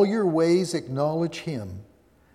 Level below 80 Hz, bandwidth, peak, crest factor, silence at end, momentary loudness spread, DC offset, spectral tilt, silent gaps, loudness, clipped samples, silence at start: -62 dBFS; 13 kHz; -10 dBFS; 16 dB; 0.5 s; 15 LU; under 0.1%; -6.5 dB/octave; none; -25 LUFS; under 0.1%; 0 s